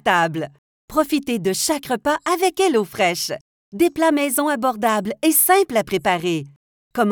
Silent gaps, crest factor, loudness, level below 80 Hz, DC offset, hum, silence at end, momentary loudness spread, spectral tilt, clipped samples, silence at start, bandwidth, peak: 0.58-0.88 s, 3.41-3.72 s, 6.56-6.91 s; 16 dB; -19 LUFS; -56 dBFS; under 0.1%; none; 0 s; 10 LU; -3.5 dB/octave; under 0.1%; 0.05 s; over 20 kHz; -4 dBFS